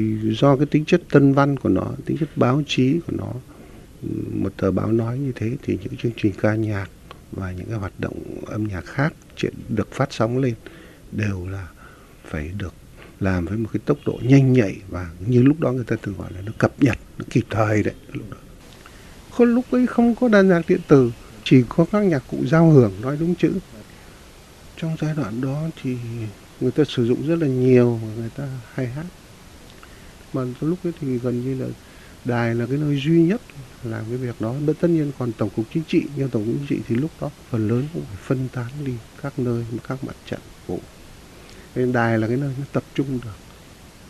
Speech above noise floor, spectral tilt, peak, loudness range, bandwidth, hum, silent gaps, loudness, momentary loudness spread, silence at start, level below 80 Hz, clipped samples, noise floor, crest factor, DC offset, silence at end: 24 dB; -8 dB/octave; 0 dBFS; 10 LU; 13 kHz; none; none; -21 LUFS; 16 LU; 0 s; -46 dBFS; under 0.1%; -45 dBFS; 22 dB; under 0.1%; 0 s